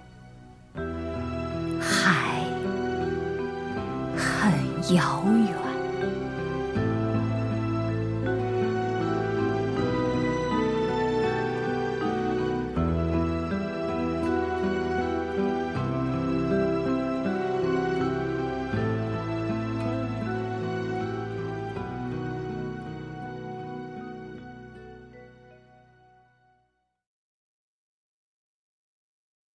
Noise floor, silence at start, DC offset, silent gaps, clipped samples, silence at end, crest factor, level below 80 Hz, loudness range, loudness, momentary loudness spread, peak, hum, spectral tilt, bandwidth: -73 dBFS; 0 s; under 0.1%; none; under 0.1%; 4 s; 20 dB; -46 dBFS; 10 LU; -28 LUFS; 12 LU; -8 dBFS; none; -6.5 dB/octave; 11 kHz